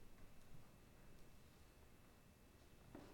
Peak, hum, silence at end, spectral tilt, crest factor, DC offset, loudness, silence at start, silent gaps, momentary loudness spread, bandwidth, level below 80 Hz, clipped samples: -44 dBFS; none; 0 s; -5 dB/octave; 18 dB; under 0.1%; -67 LUFS; 0 s; none; 4 LU; 17.5 kHz; -68 dBFS; under 0.1%